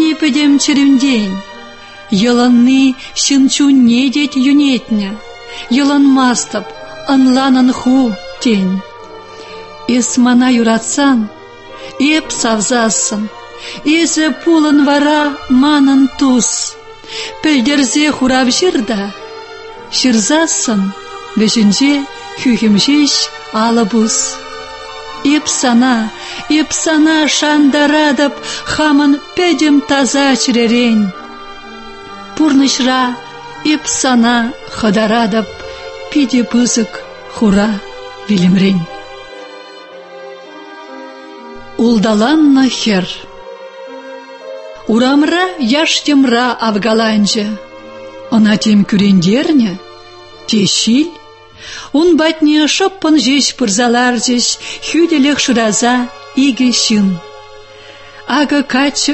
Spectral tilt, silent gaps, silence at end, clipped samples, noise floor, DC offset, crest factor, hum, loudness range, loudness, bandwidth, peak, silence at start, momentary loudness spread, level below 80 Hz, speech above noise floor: -3.5 dB/octave; none; 0 s; under 0.1%; -35 dBFS; under 0.1%; 12 dB; none; 3 LU; -11 LUFS; 8.6 kHz; 0 dBFS; 0 s; 20 LU; -46 dBFS; 25 dB